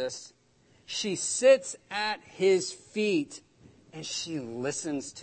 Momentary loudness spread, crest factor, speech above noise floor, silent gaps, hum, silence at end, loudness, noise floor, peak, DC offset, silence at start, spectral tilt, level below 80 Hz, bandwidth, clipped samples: 17 LU; 20 dB; 35 dB; none; none; 0 s; -29 LUFS; -64 dBFS; -10 dBFS; under 0.1%; 0 s; -3 dB/octave; -74 dBFS; 8.8 kHz; under 0.1%